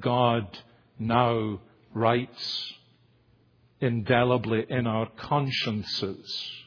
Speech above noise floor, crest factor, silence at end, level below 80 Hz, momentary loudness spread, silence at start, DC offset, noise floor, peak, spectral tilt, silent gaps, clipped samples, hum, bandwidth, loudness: 36 dB; 22 dB; 0.05 s; -60 dBFS; 11 LU; 0 s; under 0.1%; -62 dBFS; -6 dBFS; -7 dB/octave; none; under 0.1%; none; 5.4 kHz; -27 LUFS